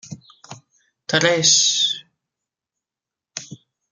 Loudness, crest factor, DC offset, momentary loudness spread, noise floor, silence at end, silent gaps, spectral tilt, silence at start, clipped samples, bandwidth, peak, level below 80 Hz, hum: -16 LUFS; 22 dB; under 0.1%; 23 LU; -88 dBFS; 0.35 s; none; -1 dB/octave; 0.05 s; under 0.1%; 13 kHz; -2 dBFS; -68 dBFS; none